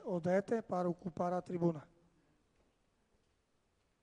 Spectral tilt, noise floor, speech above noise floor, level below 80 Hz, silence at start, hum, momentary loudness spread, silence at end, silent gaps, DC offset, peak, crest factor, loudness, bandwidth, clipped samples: -8.5 dB/octave; -78 dBFS; 41 dB; -76 dBFS; 0 s; none; 5 LU; 2.2 s; none; under 0.1%; -20 dBFS; 20 dB; -37 LUFS; 10 kHz; under 0.1%